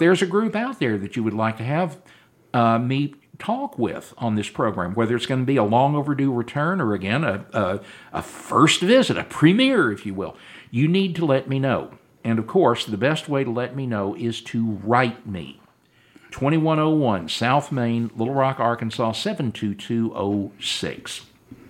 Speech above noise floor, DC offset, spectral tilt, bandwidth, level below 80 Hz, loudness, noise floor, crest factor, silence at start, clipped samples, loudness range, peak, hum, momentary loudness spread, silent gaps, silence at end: 36 dB; under 0.1%; -6 dB/octave; 16 kHz; -60 dBFS; -22 LUFS; -58 dBFS; 20 dB; 0 s; under 0.1%; 5 LU; -2 dBFS; none; 12 LU; none; 0.15 s